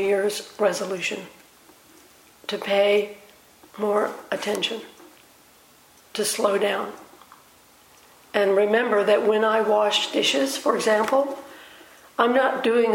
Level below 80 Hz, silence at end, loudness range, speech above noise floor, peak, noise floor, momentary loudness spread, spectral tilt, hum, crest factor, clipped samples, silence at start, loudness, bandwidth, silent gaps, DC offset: -72 dBFS; 0 s; 8 LU; 32 dB; -4 dBFS; -54 dBFS; 15 LU; -3 dB/octave; none; 20 dB; under 0.1%; 0 s; -22 LUFS; 17 kHz; none; under 0.1%